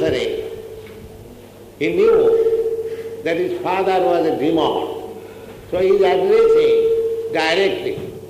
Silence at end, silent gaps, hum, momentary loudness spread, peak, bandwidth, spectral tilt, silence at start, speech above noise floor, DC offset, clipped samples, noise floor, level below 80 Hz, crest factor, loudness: 0 s; none; none; 20 LU; -4 dBFS; 15 kHz; -5.5 dB/octave; 0 s; 24 dB; under 0.1%; under 0.1%; -40 dBFS; -50 dBFS; 14 dB; -17 LUFS